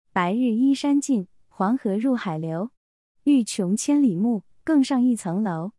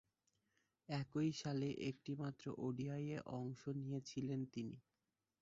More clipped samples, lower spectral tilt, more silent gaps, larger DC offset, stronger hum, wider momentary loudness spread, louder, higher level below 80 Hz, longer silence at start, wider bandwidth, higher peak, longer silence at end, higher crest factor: neither; second, -5.5 dB/octave vs -7 dB/octave; first, 2.77-3.15 s vs none; neither; neither; about the same, 8 LU vs 7 LU; first, -23 LUFS vs -46 LUFS; first, -70 dBFS vs -78 dBFS; second, 0.15 s vs 0.9 s; first, 12 kHz vs 7.6 kHz; first, -8 dBFS vs -28 dBFS; second, 0.1 s vs 0.6 s; about the same, 14 dB vs 18 dB